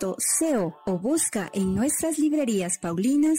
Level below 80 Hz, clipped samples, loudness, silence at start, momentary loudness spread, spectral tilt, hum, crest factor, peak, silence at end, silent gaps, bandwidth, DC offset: -56 dBFS; under 0.1%; -24 LUFS; 0 s; 5 LU; -4.5 dB/octave; none; 12 dB; -12 dBFS; 0 s; none; 16 kHz; under 0.1%